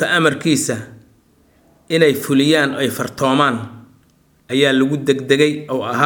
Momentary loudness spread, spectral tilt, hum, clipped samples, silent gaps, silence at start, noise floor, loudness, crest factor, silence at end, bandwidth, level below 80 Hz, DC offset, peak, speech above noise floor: 8 LU; -4.5 dB/octave; none; under 0.1%; none; 0 s; -55 dBFS; -16 LUFS; 18 dB; 0 s; over 20 kHz; -60 dBFS; under 0.1%; 0 dBFS; 39 dB